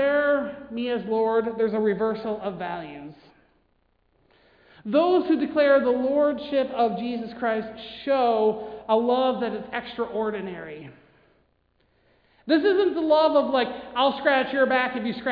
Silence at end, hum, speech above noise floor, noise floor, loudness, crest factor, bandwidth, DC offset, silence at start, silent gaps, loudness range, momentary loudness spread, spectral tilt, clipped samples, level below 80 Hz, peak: 0 s; none; 44 dB; -67 dBFS; -24 LUFS; 18 dB; 5.2 kHz; under 0.1%; 0 s; none; 7 LU; 13 LU; -8 dB/octave; under 0.1%; -62 dBFS; -6 dBFS